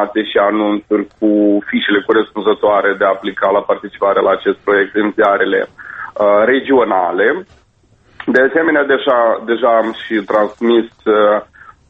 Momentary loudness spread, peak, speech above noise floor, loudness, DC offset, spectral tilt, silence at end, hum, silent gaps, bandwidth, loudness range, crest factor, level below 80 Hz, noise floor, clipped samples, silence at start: 5 LU; 0 dBFS; 39 dB; -14 LUFS; under 0.1%; -7 dB/octave; 0.45 s; none; none; 6 kHz; 1 LU; 14 dB; -54 dBFS; -52 dBFS; under 0.1%; 0 s